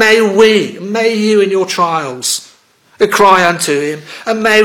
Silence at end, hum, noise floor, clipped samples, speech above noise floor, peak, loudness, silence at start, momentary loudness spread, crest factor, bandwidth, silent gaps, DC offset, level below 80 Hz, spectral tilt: 0 s; none; -48 dBFS; 1%; 37 dB; 0 dBFS; -11 LUFS; 0 s; 10 LU; 12 dB; 17.5 kHz; none; under 0.1%; -54 dBFS; -3 dB/octave